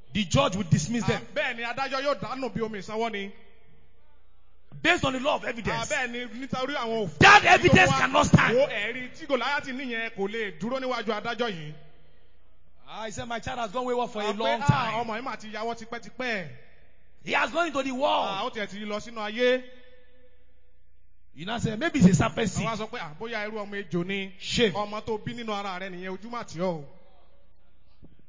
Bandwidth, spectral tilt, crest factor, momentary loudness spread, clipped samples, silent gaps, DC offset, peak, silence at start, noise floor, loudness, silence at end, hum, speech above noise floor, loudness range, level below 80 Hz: 7.6 kHz; -5 dB/octave; 24 dB; 15 LU; under 0.1%; none; 0.8%; -4 dBFS; 0.1 s; -63 dBFS; -26 LUFS; 0.25 s; none; 37 dB; 12 LU; -50 dBFS